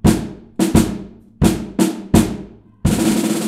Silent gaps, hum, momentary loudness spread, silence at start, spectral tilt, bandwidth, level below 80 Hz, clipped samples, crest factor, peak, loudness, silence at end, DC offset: none; none; 10 LU; 0.05 s; -5.5 dB/octave; 16 kHz; -30 dBFS; under 0.1%; 18 dB; 0 dBFS; -17 LUFS; 0 s; under 0.1%